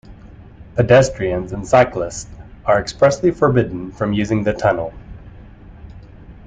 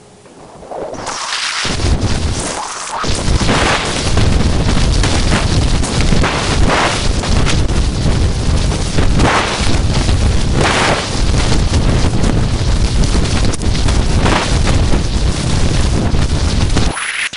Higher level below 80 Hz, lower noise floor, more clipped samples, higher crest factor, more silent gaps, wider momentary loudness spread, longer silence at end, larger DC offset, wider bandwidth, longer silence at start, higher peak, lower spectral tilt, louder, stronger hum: second, -40 dBFS vs -16 dBFS; about the same, -39 dBFS vs -38 dBFS; neither; first, 18 dB vs 12 dB; neither; first, 13 LU vs 4 LU; about the same, 0 s vs 0 s; second, under 0.1% vs 4%; second, 9.4 kHz vs 11 kHz; about the same, 0.1 s vs 0 s; about the same, -2 dBFS vs 0 dBFS; first, -6 dB/octave vs -4.5 dB/octave; about the same, -17 LUFS vs -15 LUFS; neither